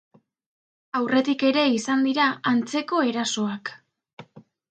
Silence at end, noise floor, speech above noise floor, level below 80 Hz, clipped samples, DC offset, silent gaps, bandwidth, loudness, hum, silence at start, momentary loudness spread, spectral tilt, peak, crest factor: 0.3 s; -49 dBFS; 26 dB; -74 dBFS; under 0.1%; under 0.1%; 4.13-4.17 s; 9.2 kHz; -23 LUFS; none; 0.95 s; 9 LU; -3.5 dB/octave; -8 dBFS; 16 dB